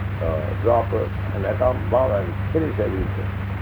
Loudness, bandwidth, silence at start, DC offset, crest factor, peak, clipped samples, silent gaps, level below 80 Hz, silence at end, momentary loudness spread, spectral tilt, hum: -22 LUFS; over 20 kHz; 0 s; under 0.1%; 16 dB; -6 dBFS; under 0.1%; none; -34 dBFS; 0 s; 6 LU; -9.5 dB/octave; none